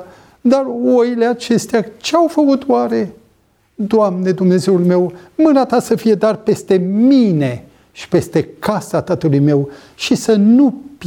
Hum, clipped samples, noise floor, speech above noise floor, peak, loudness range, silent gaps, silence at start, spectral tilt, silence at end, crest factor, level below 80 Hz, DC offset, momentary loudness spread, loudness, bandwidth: none; under 0.1%; -56 dBFS; 42 dB; -2 dBFS; 2 LU; none; 0 s; -6.5 dB/octave; 0 s; 14 dB; -54 dBFS; under 0.1%; 8 LU; -14 LUFS; 17 kHz